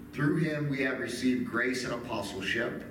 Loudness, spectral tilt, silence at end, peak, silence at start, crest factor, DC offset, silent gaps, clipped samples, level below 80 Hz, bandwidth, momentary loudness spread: -31 LUFS; -5.5 dB/octave; 0 s; -16 dBFS; 0 s; 14 dB; under 0.1%; none; under 0.1%; -60 dBFS; 16.5 kHz; 5 LU